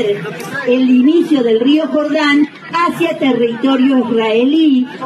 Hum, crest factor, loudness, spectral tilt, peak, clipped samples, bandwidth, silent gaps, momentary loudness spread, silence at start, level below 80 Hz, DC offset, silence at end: none; 10 dB; -13 LUFS; -5.5 dB/octave; -2 dBFS; under 0.1%; 13 kHz; none; 6 LU; 0 s; -74 dBFS; under 0.1%; 0 s